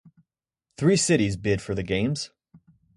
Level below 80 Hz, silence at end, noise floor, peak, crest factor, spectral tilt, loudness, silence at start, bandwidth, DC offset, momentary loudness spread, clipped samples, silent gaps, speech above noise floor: -48 dBFS; 0.7 s; -82 dBFS; -8 dBFS; 18 dB; -5 dB/octave; -24 LUFS; 0.8 s; 11.5 kHz; under 0.1%; 9 LU; under 0.1%; none; 58 dB